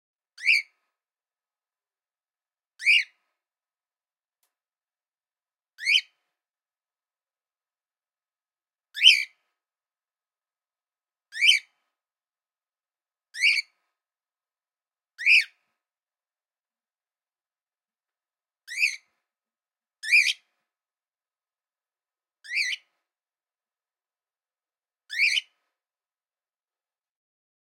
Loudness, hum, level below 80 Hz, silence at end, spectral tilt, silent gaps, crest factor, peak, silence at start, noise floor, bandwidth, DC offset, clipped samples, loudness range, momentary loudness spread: -21 LUFS; none; under -90 dBFS; 2.25 s; 10 dB/octave; none; 28 dB; -2 dBFS; 0.4 s; under -90 dBFS; 16.5 kHz; under 0.1%; under 0.1%; 9 LU; 19 LU